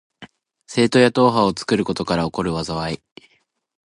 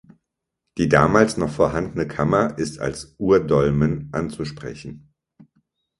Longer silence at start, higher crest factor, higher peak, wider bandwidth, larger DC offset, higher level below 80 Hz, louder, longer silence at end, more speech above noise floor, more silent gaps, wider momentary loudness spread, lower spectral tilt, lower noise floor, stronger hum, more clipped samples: second, 0.2 s vs 0.75 s; about the same, 18 dB vs 22 dB; about the same, -2 dBFS vs 0 dBFS; about the same, 11.5 kHz vs 11.5 kHz; neither; about the same, -48 dBFS vs -44 dBFS; about the same, -19 LUFS vs -20 LUFS; about the same, 0.9 s vs 1 s; second, 46 dB vs 59 dB; neither; second, 11 LU vs 16 LU; about the same, -5.5 dB/octave vs -6.5 dB/octave; second, -64 dBFS vs -80 dBFS; neither; neither